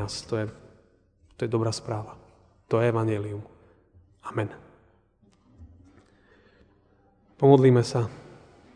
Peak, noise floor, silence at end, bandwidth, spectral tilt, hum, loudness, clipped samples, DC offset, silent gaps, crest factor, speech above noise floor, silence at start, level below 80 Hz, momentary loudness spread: -4 dBFS; -62 dBFS; 0.45 s; 10 kHz; -7 dB/octave; none; -25 LUFS; under 0.1%; under 0.1%; none; 24 dB; 39 dB; 0 s; -60 dBFS; 19 LU